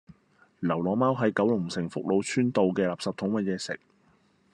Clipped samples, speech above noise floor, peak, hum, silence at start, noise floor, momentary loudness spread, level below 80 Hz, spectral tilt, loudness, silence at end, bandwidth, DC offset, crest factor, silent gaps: under 0.1%; 38 dB; -12 dBFS; none; 0.6 s; -64 dBFS; 8 LU; -70 dBFS; -6 dB/octave; -27 LUFS; 0.75 s; 11 kHz; under 0.1%; 16 dB; none